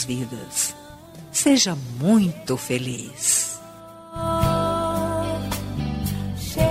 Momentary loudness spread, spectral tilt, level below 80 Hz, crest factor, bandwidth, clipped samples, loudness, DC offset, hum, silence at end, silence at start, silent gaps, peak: 15 LU; -4 dB/octave; -40 dBFS; 16 dB; 16 kHz; under 0.1%; -23 LUFS; under 0.1%; none; 0 s; 0 s; none; -6 dBFS